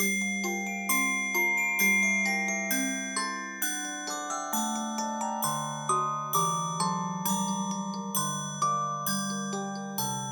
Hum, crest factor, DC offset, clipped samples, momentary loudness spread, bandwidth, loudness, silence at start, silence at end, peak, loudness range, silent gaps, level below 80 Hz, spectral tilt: none; 16 dB; under 0.1%; under 0.1%; 8 LU; over 20 kHz; -28 LUFS; 0 s; 0 s; -14 dBFS; 4 LU; none; -78 dBFS; -2.5 dB/octave